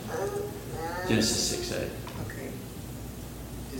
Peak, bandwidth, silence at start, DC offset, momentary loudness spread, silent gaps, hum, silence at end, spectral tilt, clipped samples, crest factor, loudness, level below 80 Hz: -10 dBFS; 17 kHz; 0 s; under 0.1%; 15 LU; none; none; 0 s; -3.5 dB/octave; under 0.1%; 22 dB; -32 LUFS; -46 dBFS